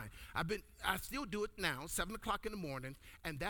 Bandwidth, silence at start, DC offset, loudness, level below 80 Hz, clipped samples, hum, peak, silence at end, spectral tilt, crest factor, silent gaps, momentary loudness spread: over 20 kHz; 0 s; under 0.1%; -41 LUFS; -56 dBFS; under 0.1%; none; -18 dBFS; 0 s; -3.5 dB/octave; 24 dB; none; 8 LU